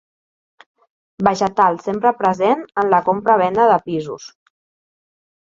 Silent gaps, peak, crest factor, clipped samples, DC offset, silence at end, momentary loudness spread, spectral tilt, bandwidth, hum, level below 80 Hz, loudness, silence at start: none; 0 dBFS; 18 dB; under 0.1%; under 0.1%; 1.15 s; 9 LU; -6 dB/octave; 7.6 kHz; none; -58 dBFS; -17 LUFS; 1.2 s